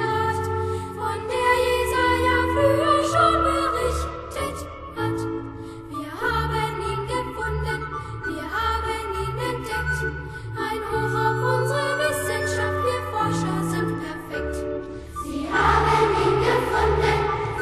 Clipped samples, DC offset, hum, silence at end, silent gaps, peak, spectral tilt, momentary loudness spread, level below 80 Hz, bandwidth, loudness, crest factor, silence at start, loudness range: under 0.1%; under 0.1%; none; 0 s; none; -6 dBFS; -5 dB/octave; 11 LU; -36 dBFS; 13 kHz; -23 LUFS; 18 dB; 0 s; 7 LU